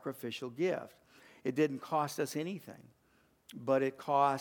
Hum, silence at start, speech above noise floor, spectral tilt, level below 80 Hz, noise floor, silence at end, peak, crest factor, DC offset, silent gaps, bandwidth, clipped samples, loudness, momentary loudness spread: none; 0.05 s; 36 dB; -5.5 dB/octave; -82 dBFS; -70 dBFS; 0 s; -16 dBFS; 20 dB; under 0.1%; none; 19 kHz; under 0.1%; -35 LUFS; 14 LU